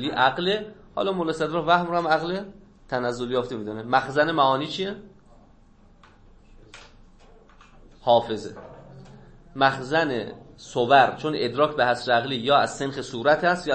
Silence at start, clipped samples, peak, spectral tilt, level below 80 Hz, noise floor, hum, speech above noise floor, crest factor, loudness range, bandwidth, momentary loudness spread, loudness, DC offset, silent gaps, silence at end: 0 s; under 0.1%; -4 dBFS; -5 dB/octave; -54 dBFS; -53 dBFS; none; 30 dB; 20 dB; 8 LU; 8.8 kHz; 13 LU; -23 LUFS; under 0.1%; none; 0 s